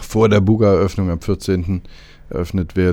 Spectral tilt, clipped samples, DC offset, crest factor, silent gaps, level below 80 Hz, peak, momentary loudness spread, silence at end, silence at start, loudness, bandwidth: -7.5 dB/octave; under 0.1%; under 0.1%; 16 dB; none; -34 dBFS; 0 dBFS; 12 LU; 0 s; 0 s; -17 LUFS; 16 kHz